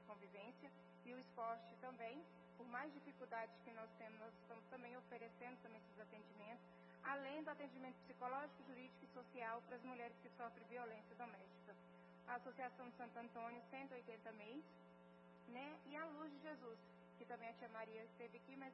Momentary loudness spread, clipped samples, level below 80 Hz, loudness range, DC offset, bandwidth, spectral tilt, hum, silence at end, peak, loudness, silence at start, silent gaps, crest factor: 12 LU; under 0.1%; under -90 dBFS; 3 LU; under 0.1%; 5.6 kHz; -4 dB/octave; none; 0 s; -34 dBFS; -56 LUFS; 0 s; none; 22 dB